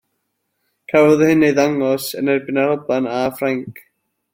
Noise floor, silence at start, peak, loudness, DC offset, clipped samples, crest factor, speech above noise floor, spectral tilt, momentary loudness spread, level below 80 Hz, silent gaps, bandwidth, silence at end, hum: -72 dBFS; 0.9 s; -2 dBFS; -17 LUFS; under 0.1%; under 0.1%; 16 dB; 56 dB; -6 dB/octave; 9 LU; -58 dBFS; none; 16.5 kHz; 0.6 s; none